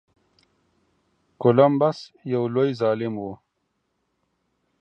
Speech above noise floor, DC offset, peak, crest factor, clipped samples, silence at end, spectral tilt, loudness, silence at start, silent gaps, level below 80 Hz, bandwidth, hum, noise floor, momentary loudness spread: 53 dB; under 0.1%; -2 dBFS; 22 dB; under 0.1%; 1.45 s; -8.5 dB/octave; -22 LUFS; 1.4 s; none; -68 dBFS; 8.4 kHz; none; -74 dBFS; 15 LU